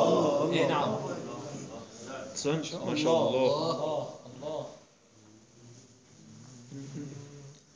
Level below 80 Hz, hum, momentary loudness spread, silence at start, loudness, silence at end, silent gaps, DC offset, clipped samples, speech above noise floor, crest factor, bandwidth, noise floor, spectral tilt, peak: -72 dBFS; none; 20 LU; 0 s; -31 LUFS; 0.15 s; none; under 0.1%; under 0.1%; 29 dB; 18 dB; 10 kHz; -59 dBFS; -5 dB/octave; -14 dBFS